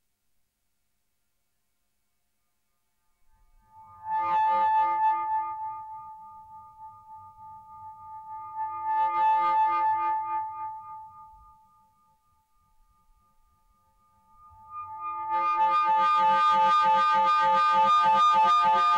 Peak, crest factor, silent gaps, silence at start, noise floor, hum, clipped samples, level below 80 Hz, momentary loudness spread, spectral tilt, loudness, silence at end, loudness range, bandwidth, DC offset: -16 dBFS; 12 dB; none; 3.8 s; -79 dBFS; none; under 0.1%; -70 dBFS; 23 LU; -3 dB/octave; -24 LUFS; 0 s; 18 LU; 9 kHz; under 0.1%